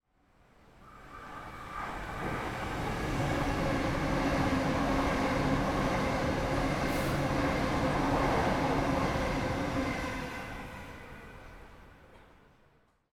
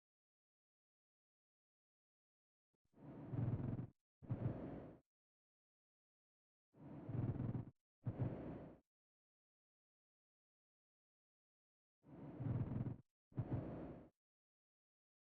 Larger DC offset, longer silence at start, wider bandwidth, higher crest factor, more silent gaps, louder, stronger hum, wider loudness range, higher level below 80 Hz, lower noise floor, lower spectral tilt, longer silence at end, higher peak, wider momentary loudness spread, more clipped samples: neither; second, 0.8 s vs 2.95 s; first, 17.5 kHz vs 3.7 kHz; about the same, 16 dB vs 18 dB; second, none vs 4.01-4.21 s, 5.01-6.73 s, 7.81-8.02 s, 8.87-12.02 s, 13.11-13.31 s; first, -31 LUFS vs -48 LUFS; neither; first, 8 LU vs 5 LU; first, -42 dBFS vs -68 dBFS; second, -66 dBFS vs under -90 dBFS; second, -6 dB/octave vs -11 dB/octave; second, 0.95 s vs 1.25 s; first, -16 dBFS vs -32 dBFS; about the same, 16 LU vs 16 LU; neither